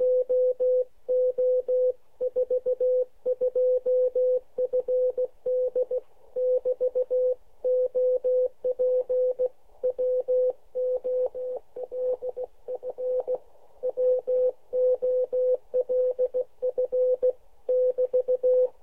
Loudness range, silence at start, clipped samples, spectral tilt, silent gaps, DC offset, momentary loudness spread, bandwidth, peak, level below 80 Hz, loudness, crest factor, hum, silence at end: 4 LU; 0 s; under 0.1%; -7.5 dB/octave; none; 0.3%; 8 LU; 1.3 kHz; -16 dBFS; -66 dBFS; -26 LUFS; 10 dB; none; 0.15 s